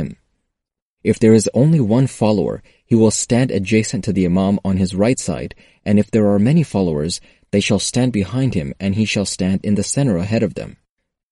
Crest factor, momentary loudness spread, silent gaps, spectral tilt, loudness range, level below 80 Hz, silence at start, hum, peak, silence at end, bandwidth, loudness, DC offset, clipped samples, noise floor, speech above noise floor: 16 dB; 10 LU; 0.82-0.97 s; -6 dB/octave; 3 LU; -44 dBFS; 0 s; none; -2 dBFS; 0.6 s; 11.5 kHz; -17 LUFS; under 0.1%; under 0.1%; -81 dBFS; 65 dB